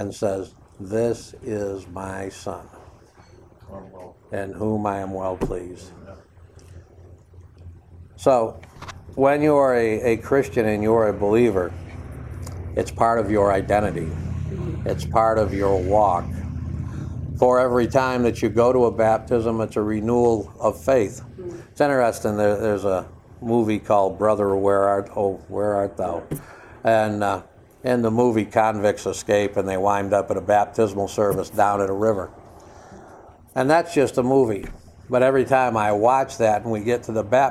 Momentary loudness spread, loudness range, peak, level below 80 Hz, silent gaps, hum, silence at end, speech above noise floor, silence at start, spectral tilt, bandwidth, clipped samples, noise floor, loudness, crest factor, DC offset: 15 LU; 10 LU; -2 dBFS; -44 dBFS; none; none; 0 s; 28 dB; 0 s; -6.5 dB/octave; 15 kHz; under 0.1%; -49 dBFS; -21 LUFS; 20 dB; under 0.1%